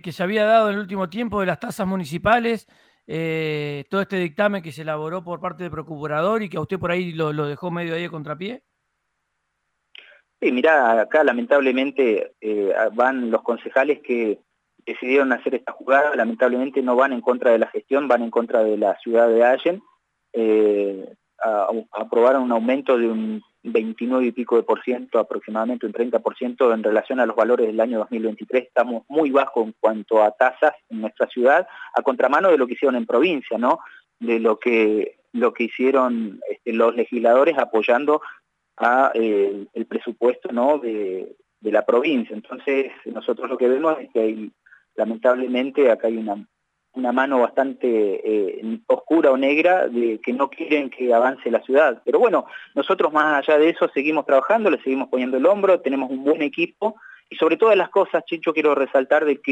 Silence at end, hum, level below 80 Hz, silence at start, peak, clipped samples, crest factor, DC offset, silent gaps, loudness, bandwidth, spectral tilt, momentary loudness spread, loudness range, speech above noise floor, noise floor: 0 s; none; -64 dBFS; 0.05 s; -4 dBFS; under 0.1%; 16 dB; under 0.1%; none; -20 LUFS; 10 kHz; -7 dB/octave; 11 LU; 5 LU; 55 dB; -75 dBFS